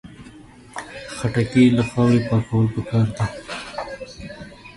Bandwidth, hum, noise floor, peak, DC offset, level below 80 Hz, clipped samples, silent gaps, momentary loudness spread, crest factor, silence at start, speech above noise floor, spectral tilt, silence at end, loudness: 11.5 kHz; none; -44 dBFS; -4 dBFS; under 0.1%; -46 dBFS; under 0.1%; none; 20 LU; 18 dB; 0.05 s; 26 dB; -7 dB/octave; 0.05 s; -20 LUFS